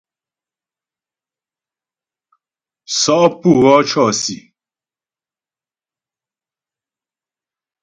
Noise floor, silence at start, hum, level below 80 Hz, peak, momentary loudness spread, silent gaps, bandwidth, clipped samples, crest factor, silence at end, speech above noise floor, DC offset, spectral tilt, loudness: under -90 dBFS; 2.9 s; none; -58 dBFS; 0 dBFS; 11 LU; none; 10 kHz; under 0.1%; 20 dB; 3.45 s; over 77 dB; under 0.1%; -4 dB/octave; -13 LUFS